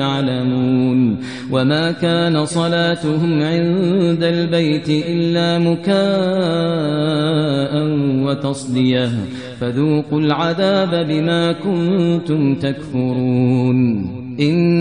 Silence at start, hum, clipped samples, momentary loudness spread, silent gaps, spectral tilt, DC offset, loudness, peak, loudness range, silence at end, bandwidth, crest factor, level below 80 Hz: 0 s; none; under 0.1%; 4 LU; none; -7 dB/octave; 0.3%; -17 LUFS; -2 dBFS; 2 LU; 0 s; 10 kHz; 14 dB; -54 dBFS